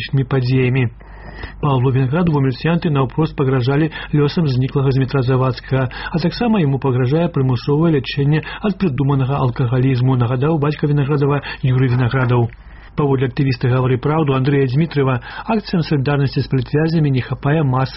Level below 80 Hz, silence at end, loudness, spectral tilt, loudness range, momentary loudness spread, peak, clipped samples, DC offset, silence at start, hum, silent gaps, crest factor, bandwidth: -38 dBFS; 0 s; -17 LUFS; -7 dB/octave; 1 LU; 4 LU; -4 dBFS; under 0.1%; under 0.1%; 0 s; none; none; 12 dB; 5.8 kHz